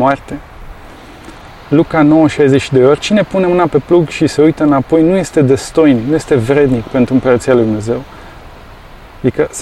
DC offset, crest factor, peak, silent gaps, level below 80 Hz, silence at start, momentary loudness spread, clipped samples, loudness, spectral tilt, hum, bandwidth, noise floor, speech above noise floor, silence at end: under 0.1%; 12 dB; 0 dBFS; none; -36 dBFS; 0 s; 8 LU; under 0.1%; -11 LUFS; -6.5 dB/octave; none; 12.5 kHz; -34 dBFS; 24 dB; 0 s